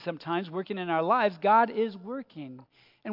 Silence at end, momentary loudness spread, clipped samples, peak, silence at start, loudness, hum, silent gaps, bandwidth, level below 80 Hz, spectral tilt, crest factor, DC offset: 0 s; 20 LU; under 0.1%; -12 dBFS; 0 s; -27 LUFS; none; none; 5.8 kHz; -84 dBFS; -8.5 dB/octave; 18 dB; under 0.1%